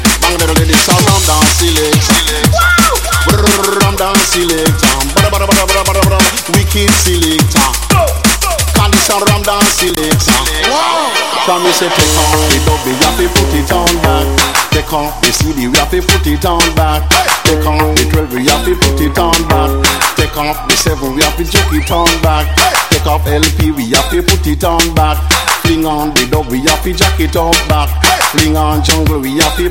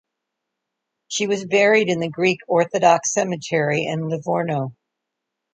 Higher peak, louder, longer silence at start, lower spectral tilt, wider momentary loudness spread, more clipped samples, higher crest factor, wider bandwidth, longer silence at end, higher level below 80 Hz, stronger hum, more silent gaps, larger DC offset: about the same, 0 dBFS vs -2 dBFS; first, -10 LUFS vs -20 LUFS; second, 0 s vs 1.1 s; about the same, -3.5 dB/octave vs -4 dB/octave; second, 4 LU vs 9 LU; first, 0.4% vs under 0.1%; second, 10 dB vs 20 dB; first, 17.5 kHz vs 9.4 kHz; second, 0 s vs 0.8 s; first, -18 dBFS vs -68 dBFS; neither; neither; first, 1% vs under 0.1%